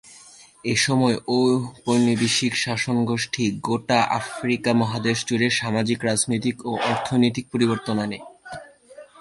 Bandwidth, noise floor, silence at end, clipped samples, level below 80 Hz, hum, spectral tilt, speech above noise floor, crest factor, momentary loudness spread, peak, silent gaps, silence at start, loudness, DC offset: 11.5 kHz; -48 dBFS; 0.2 s; under 0.1%; -58 dBFS; none; -4.5 dB/octave; 26 dB; 18 dB; 6 LU; -4 dBFS; none; 0.05 s; -22 LUFS; under 0.1%